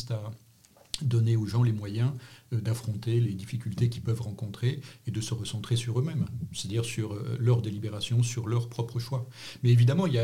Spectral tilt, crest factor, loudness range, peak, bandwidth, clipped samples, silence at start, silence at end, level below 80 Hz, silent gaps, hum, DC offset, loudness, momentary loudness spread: -6.5 dB/octave; 20 dB; 3 LU; -8 dBFS; 12.5 kHz; under 0.1%; 0 s; 0 s; -60 dBFS; none; none; under 0.1%; -29 LUFS; 10 LU